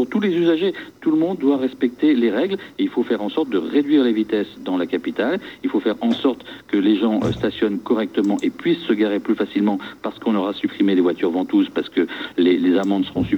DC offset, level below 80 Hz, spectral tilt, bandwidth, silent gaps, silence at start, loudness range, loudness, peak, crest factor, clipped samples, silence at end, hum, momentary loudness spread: under 0.1%; -54 dBFS; -7 dB/octave; 8.2 kHz; none; 0 s; 2 LU; -20 LUFS; -6 dBFS; 14 dB; under 0.1%; 0 s; none; 6 LU